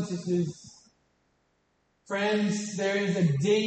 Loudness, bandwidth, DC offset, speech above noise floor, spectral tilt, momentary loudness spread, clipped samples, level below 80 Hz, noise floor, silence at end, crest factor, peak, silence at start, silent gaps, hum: -28 LUFS; 8.8 kHz; under 0.1%; 45 dB; -5.5 dB/octave; 9 LU; under 0.1%; -70 dBFS; -72 dBFS; 0 s; 16 dB; -14 dBFS; 0 s; none; none